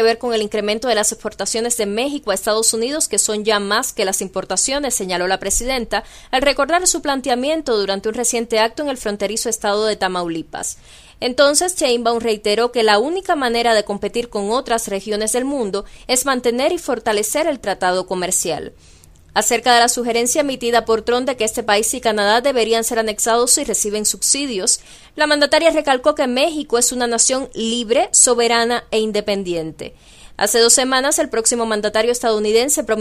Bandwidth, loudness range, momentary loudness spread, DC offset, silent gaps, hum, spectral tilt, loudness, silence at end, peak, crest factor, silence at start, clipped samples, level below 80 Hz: 15.5 kHz; 4 LU; 9 LU; under 0.1%; none; none; -1.5 dB/octave; -17 LUFS; 0 s; 0 dBFS; 18 dB; 0 s; under 0.1%; -44 dBFS